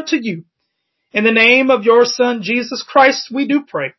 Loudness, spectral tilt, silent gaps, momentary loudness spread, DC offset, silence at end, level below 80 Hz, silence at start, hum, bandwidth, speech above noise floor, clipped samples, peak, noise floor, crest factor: -13 LUFS; -4 dB/octave; none; 10 LU; under 0.1%; 0.1 s; -66 dBFS; 0 s; none; 6.2 kHz; 58 dB; under 0.1%; 0 dBFS; -72 dBFS; 14 dB